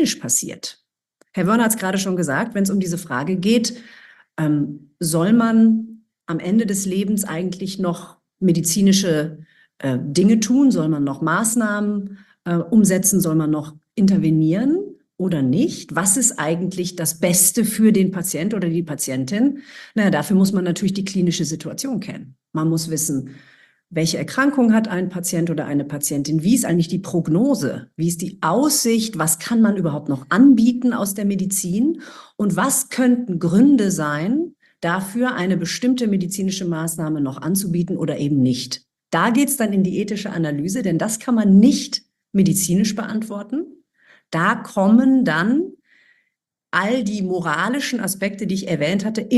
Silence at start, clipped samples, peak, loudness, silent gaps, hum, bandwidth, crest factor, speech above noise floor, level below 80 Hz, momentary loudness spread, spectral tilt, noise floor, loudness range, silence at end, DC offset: 0 s; under 0.1%; -2 dBFS; -19 LUFS; none; none; 13 kHz; 18 dB; 56 dB; -58 dBFS; 11 LU; -5 dB/octave; -75 dBFS; 4 LU; 0 s; under 0.1%